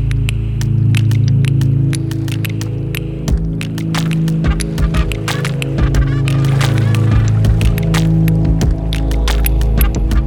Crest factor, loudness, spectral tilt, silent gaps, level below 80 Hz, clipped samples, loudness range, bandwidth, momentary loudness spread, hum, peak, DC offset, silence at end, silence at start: 12 dB; -15 LUFS; -6.5 dB/octave; none; -18 dBFS; under 0.1%; 4 LU; 17 kHz; 6 LU; none; 0 dBFS; under 0.1%; 0 s; 0 s